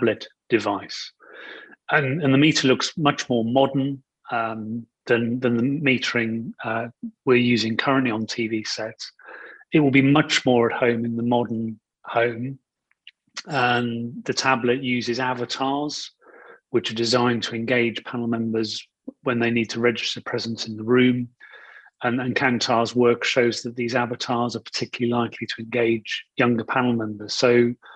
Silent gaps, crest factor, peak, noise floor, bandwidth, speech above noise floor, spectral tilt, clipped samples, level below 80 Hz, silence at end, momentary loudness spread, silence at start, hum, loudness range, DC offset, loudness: none; 20 dB; -4 dBFS; -54 dBFS; 8.8 kHz; 31 dB; -5 dB/octave; under 0.1%; -64 dBFS; 0 s; 14 LU; 0 s; none; 3 LU; under 0.1%; -22 LUFS